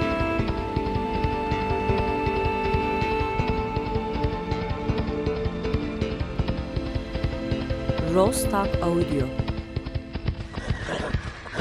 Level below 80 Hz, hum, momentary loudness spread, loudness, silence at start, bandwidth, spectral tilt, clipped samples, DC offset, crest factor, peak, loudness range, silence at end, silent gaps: -34 dBFS; none; 7 LU; -27 LUFS; 0 s; 15 kHz; -6 dB/octave; under 0.1%; under 0.1%; 18 dB; -8 dBFS; 3 LU; 0 s; none